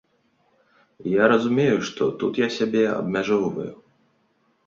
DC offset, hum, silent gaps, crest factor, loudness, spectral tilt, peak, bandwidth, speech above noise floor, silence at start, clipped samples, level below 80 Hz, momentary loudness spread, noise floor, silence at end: under 0.1%; none; none; 20 dB; -22 LUFS; -6 dB/octave; -4 dBFS; 7.6 kHz; 44 dB; 1 s; under 0.1%; -62 dBFS; 10 LU; -66 dBFS; 0.95 s